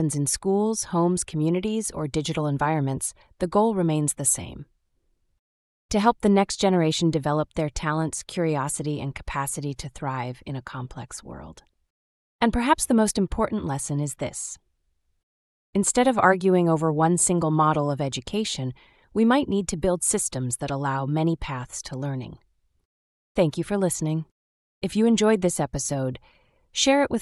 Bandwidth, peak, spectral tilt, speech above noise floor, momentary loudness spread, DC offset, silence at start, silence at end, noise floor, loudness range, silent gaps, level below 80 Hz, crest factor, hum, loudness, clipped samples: 13.5 kHz; -4 dBFS; -5 dB/octave; 47 dB; 13 LU; under 0.1%; 0 s; 0 s; -71 dBFS; 7 LU; 5.39-5.89 s, 11.90-12.39 s, 15.23-15.73 s, 22.85-23.35 s, 24.31-24.81 s; -46 dBFS; 20 dB; none; -24 LUFS; under 0.1%